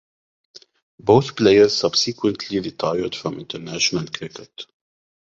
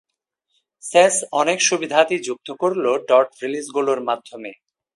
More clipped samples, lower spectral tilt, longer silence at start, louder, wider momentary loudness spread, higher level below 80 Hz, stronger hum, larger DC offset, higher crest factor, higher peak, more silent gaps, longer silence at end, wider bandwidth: neither; first, -4.5 dB/octave vs -2 dB/octave; first, 1.05 s vs 0.85 s; about the same, -19 LUFS vs -19 LUFS; first, 20 LU vs 14 LU; first, -54 dBFS vs -74 dBFS; neither; neither; about the same, 20 dB vs 20 dB; about the same, -2 dBFS vs 0 dBFS; neither; first, 0.6 s vs 0.4 s; second, 7.8 kHz vs 11.5 kHz